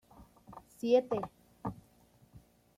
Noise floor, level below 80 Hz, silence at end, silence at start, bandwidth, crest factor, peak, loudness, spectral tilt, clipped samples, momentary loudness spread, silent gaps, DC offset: -65 dBFS; -66 dBFS; 0.4 s; 0.2 s; 14.5 kHz; 22 dB; -16 dBFS; -34 LUFS; -6.5 dB/octave; under 0.1%; 25 LU; none; under 0.1%